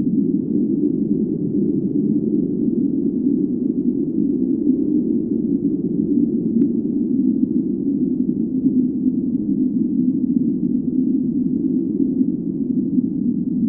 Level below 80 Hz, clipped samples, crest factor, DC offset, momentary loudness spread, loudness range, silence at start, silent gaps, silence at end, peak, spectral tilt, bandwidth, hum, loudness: -52 dBFS; under 0.1%; 14 dB; under 0.1%; 2 LU; 1 LU; 0 s; none; 0 s; -4 dBFS; -17 dB/octave; 1 kHz; none; -20 LUFS